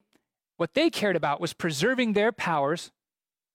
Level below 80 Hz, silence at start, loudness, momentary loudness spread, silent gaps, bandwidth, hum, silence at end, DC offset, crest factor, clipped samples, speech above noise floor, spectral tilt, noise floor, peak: -68 dBFS; 0.6 s; -26 LUFS; 7 LU; none; 16.5 kHz; none; 0.65 s; under 0.1%; 14 dB; under 0.1%; over 64 dB; -4.5 dB/octave; under -90 dBFS; -14 dBFS